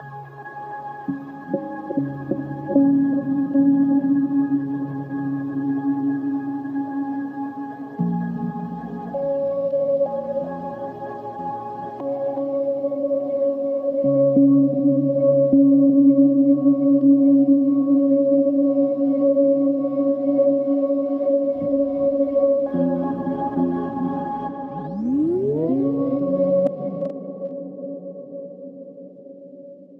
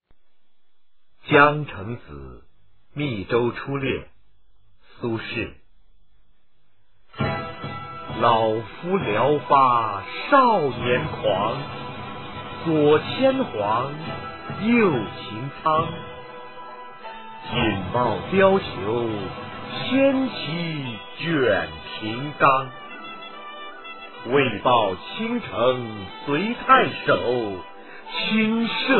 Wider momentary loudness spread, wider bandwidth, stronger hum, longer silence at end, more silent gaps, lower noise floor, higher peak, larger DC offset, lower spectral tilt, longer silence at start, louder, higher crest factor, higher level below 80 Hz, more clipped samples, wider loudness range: second, 16 LU vs 19 LU; second, 2.2 kHz vs 4.4 kHz; neither; about the same, 0.05 s vs 0 s; neither; second, -41 dBFS vs -72 dBFS; second, -6 dBFS vs -2 dBFS; second, under 0.1% vs 0.5%; first, -12 dB/octave vs -9.5 dB/octave; about the same, 0 s vs 0 s; about the same, -20 LUFS vs -22 LUFS; second, 14 dB vs 22 dB; second, -62 dBFS vs -52 dBFS; neither; about the same, 10 LU vs 8 LU